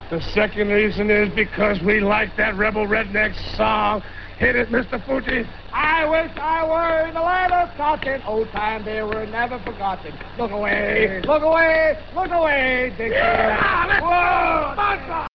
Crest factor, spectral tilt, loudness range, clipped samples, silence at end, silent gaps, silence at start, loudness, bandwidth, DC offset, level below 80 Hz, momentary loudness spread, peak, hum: 16 dB; -7.5 dB/octave; 5 LU; under 0.1%; 0 s; none; 0 s; -20 LUFS; 6.2 kHz; 0.8%; -36 dBFS; 8 LU; -4 dBFS; none